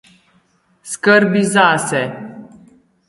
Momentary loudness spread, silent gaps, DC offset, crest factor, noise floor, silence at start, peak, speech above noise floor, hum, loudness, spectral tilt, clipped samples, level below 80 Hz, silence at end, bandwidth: 18 LU; none; under 0.1%; 18 dB; -58 dBFS; 0.85 s; 0 dBFS; 44 dB; none; -14 LUFS; -4.5 dB/octave; under 0.1%; -62 dBFS; 0.65 s; 11.5 kHz